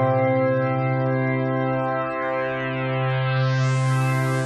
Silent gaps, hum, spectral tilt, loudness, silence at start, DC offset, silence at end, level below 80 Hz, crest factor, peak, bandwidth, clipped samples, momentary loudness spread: none; none; -7 dB/octave; -22 LUFS; 0 s; under 0.1%; 0 s; -58 dBFS; 12 dB; -10 dBFS; 12 kHz; under 0.1%; 4 LU